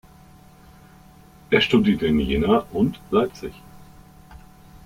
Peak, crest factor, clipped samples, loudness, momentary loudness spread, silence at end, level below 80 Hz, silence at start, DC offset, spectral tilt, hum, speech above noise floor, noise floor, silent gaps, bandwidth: -4 dBFS; 20 dB; under 0.1%; -20 LUFS; 9 LU; 0.1 s; -42 dBFS; 1.5 s; under 0.1%; -6.5 dB/octave; none; 28 dB; -49 dBFS; none; 15.5 kHz